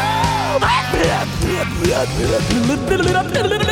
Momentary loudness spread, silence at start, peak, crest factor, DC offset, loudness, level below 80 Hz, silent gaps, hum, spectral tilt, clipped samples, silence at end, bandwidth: 3 LU; 0 s; -4 dBFS; 14 dB; under 0.1%; -17 LUFS; -30 dBFS; none; none; -5 dB/octave; under 0.1%; 0 s; 16.5 kHz